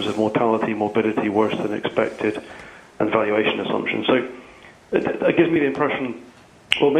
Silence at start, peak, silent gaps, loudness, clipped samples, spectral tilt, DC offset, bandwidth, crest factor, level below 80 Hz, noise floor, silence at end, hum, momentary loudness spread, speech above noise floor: 0 s; 0 dBFS; none; -21 LUFS; under 0.1%; -6 dB/octave; under 0.1%; 10.5 kHz; 22 dB; -58 dBFS; -46 dBFS; 0 s; none; 12 LU; 25 dB